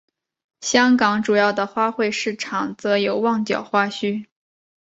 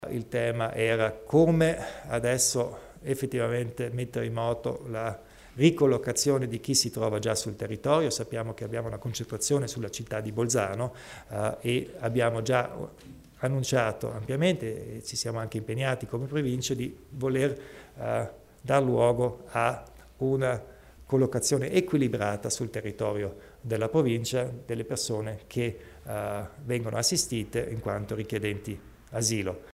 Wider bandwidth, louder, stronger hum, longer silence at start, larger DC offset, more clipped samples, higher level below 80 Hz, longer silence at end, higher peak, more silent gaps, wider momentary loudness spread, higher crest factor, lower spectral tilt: second, 8 kHz vs 16 kHz; first, -20 LUFS vs -29 LUFS; neither; first, 0.6 s vs 0 s; neither; neither; second, -66 dBFS vs -54 dBFS; first, 0.7 s vs 0.05 s; first, -2 dBFS vs -10 dBFS; neither; about the same, 9 LU vs 11 LU; about the same, 20 dB vs 20 dB; about the same, -4 dB/octave vs -4.5 dB/octave